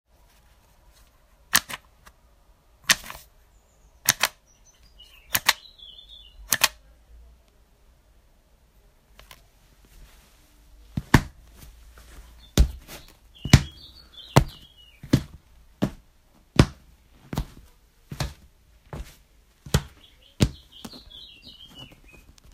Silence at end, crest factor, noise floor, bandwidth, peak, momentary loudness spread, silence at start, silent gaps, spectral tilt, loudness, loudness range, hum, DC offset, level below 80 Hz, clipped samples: 0.7 s; 30 dB; -59 dBFS; 16 kHz; 0 dBFS; 23 LU; 1.55 s; none; -4 dB/octave; -25 LUFS; 7 LU; none; under 0.1%; -38 dBFS; under 0.1%